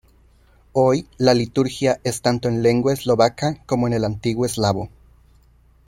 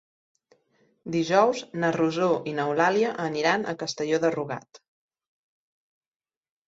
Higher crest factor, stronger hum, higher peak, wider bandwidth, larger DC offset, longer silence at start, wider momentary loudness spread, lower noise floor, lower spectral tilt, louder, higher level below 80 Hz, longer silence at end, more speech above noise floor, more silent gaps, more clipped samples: about the same, 20 dB vs 20 dB; neither; first, -2 dBFS vs -8 dBFS; first, 16.5 kHz vs 8 kHz; neither; second, 0.75 s vs 1.05 s; second, 5 LU vs 9 LU; second, -54 dBFS vs -67 dBFS; about the same, -6 dB/octave vs -5 dB/octave; first, -20 LUFS vs -25 LUFS; first, -48 dBFS vs -70 dBFS; second, 1 s vs 1.9 s; second, 35 dB vs 42 dB; neither; neither